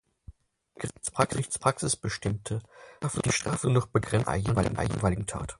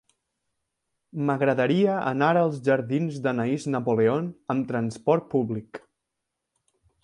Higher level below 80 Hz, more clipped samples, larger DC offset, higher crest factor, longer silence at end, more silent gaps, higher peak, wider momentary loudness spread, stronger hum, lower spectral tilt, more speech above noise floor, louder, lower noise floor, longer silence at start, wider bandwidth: first, -46 dBFS vs -68 dBFS; neither; neither; about the same, 22 dB vs 18 dB; second, 0.05 s vs 1.25 s; neither; about the same, -8 dBFS vs -8 dBFS; about the same, 9 LU vs 8 LU; neither; second, -5 dB/octave vs -7.5 dB/octave; second, 29 dB vs 59 dB; second, -29 LUFS vs -25 LUFS; second, -57 dBFS vs -83 dBFS; second, 0.3 s vs 1.15 s; about the same, 11.5 kHz vs 11 kHz